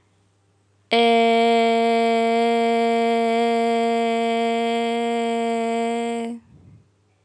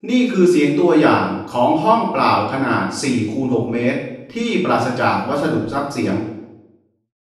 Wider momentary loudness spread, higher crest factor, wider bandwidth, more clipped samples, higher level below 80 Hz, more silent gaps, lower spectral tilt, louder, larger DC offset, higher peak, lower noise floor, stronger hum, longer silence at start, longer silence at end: about the same, 7 LU vs 8 LU; about the same, 14 dB vs 16 dB; second, 11 kHz vs 12.5 kHz; neither; second, -74 dBFS vs -58 dBFS; neither; second, -4 dB/octave vs -6 dB/octave; second, -20 LUFS vs -17 LUFS; neither; second, -6 dBFS vs -2 dBFS; first, -62 dBFS vs -54 dBFS; neither; first, 0.9 s vs 0.05 s; first, 0.85 s vs 0.7 s